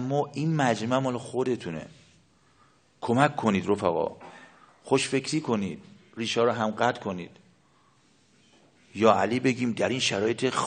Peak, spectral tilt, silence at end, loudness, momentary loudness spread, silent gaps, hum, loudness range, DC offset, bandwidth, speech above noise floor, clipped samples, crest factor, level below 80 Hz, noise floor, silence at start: -4 dBFS; -5 dB/octave; 0 s; -26 LUFS; 15 LU; none; none; 3 LU; under 0.1%; 9.4 kHz; 37 dB; under 0.1%; 24 dB; -70 dBFS; -63 dBFS; 0 s